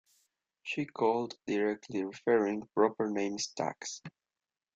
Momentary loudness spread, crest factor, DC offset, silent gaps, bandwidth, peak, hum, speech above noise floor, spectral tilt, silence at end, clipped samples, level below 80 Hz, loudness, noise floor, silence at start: 12 LU; 22 dB; under 0.1%; none; 8.2 kHz; -12 dBFS; none; over 58 dB; -4.5 dB/octave; 0.65 s; under 0.1%; -76 dBFS; -33 LUFS; under -90 dBFS; 0.65 s